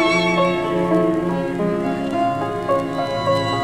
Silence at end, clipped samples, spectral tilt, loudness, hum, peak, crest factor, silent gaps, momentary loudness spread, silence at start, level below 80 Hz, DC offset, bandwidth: 0 s; under 0.1%; -6 dB/octave; -20 LUFS; none; -6 dBFS; 14 dB; none; 5 LU; 0 s; -48 dBFS; under 0.1%; 13.5 kHz